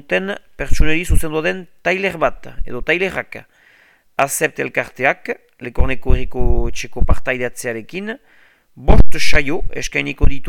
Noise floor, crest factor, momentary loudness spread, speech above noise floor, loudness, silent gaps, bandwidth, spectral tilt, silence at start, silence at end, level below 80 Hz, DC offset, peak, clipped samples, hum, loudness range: -52 dBFS; 14 dB; 11 LU; 39 dB; -20 LUFS; none; 14.5 kHz; -5 dB/octave; 0.1 s; 0 s; -20 dBFS; under 0.1%; 0 dBFS; 1%; none; 2 LU